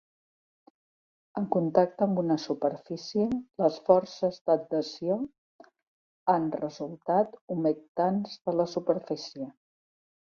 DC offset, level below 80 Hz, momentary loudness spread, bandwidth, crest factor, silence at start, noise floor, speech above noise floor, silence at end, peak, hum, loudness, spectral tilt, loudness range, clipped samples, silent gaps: under 0.1%; -70 dBFS; 11 LU; 7 kHz; 22 dB; 1.35 s; under -90 dBFS; over 62 dB; 0.85 s; -8 dBFS; none; -29 LUFS; -7 dB/octave; 3 LU; under 0.1%; 4.41-4.45 s, 5.38-5.59 s, 5.87-6.26 s, 7.41-7.48 s, 7.88-7.95 s